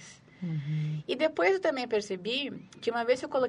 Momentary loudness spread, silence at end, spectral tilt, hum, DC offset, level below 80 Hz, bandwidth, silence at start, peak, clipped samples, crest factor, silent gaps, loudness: 10 LU; 0 s; -5.5 dB/octave; none; under 0.1%; -72 dBFS; 11 kHz; 0 s; -12 dBFS; under 0.1%; 18 dB; none; -30 LUFS